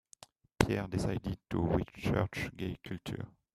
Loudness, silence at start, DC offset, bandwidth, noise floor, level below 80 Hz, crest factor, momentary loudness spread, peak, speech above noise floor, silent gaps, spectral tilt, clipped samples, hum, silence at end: -35 LUFS; 0.6 s; under 0.1%; 15 kHz; -60 dBFS; -50 dBFS; 30 dB; 10 LU; -6 dBFS; 25 dB; none; -6.5 dB/octave; under 0.1%; none; 0.25 s